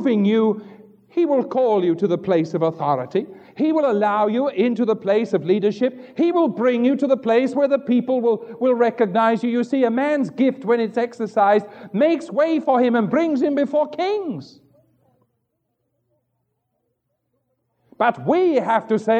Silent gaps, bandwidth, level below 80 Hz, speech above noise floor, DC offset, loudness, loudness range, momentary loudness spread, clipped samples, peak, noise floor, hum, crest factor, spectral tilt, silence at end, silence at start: none; 8.8 kHz; -76 dBFS; 54 dB; under 0.1%; -20 LUFS; 6 LU; 5 LU; under 0.1%; -4 dBFS; -73 dBFS; none; 14 dB; -7.5 dB/octave; 0 s; 0 s